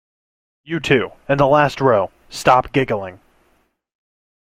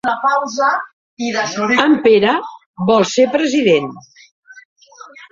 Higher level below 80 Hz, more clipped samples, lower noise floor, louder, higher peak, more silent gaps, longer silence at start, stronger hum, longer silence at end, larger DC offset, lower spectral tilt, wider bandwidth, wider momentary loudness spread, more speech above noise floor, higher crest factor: first, -48 dBFS vs -60 dBFS; neither; first, -62 dBFS vs -40 dBFS; about the same, -17 LUFS vs -15 LUFS; about the same, -2 dBFS vs -2 dBFS; second, none vs 0.93-1.17 s, 2.66-2.74 s, 4.31-4.43 s, 4.65-4.76 s; first, 0.7 s vs 0.05 s; neither; first, 1.4 s vs 0.05 s; neither; first, -6 dB/octave vs -4.5 dB/octave; first, 16 kHz vs 7.8 kHz; about the same, 11 LU vs 11 LU; first, 45 dB vs 25 dB; about the same, 18 dB vs 14 dB